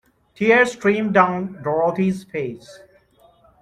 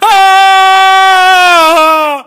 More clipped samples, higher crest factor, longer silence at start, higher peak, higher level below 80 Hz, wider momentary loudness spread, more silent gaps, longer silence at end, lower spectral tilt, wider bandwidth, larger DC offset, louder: second, under 0.1% vs 2%; first, 18 dB vs 6 dB; first, 0.4 s vs 0 s; about the same, -2 dBFS vs 0 dBFS; second, -58 dBFS vs -52 dBFS; first, 13 LU vs 2 LU; neither; first, 0.85 s vs 0.05 s; first, -6.5 dB/octave vs 0.5 dB/octave; second, 12 kHz vs 16 kHz; second, under 0.1% vs 1%; second, -19 LUFS vs -4 LUFS